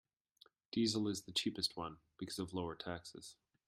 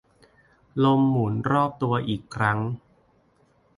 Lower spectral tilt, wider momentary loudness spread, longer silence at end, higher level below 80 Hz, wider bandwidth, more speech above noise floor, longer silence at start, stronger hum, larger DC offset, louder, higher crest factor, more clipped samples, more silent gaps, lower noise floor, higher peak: second, -4 dB/octave vs -8 dB/octave; first, 15 LU vs 11 LU; second, 0.35 s vs 1 s; second, -72 dBFS vs -58 dBFS; first, 16 kHz vs 11 kHz; second, 29 dB vs 40 dB; about the same, 0.75 s vs 0.75 s; neither; neither; second, -41 LUFS vs -24 LUFS; about the same, 20 dB vs 18 dB; neither; neither; first, -70 dBFS vs -62 dBFS; second, -22 dBFS vs -6 dBFS